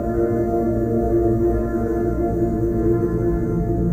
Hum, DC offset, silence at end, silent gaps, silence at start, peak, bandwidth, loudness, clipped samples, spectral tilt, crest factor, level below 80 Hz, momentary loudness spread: none; under 0.1%; 0 s; none; 0 s; -8 dBFS; 16 kHz; -20 LUFS; under 0.1%; -11 dB/octave; 12 dB; -28 dBFS; 3 LU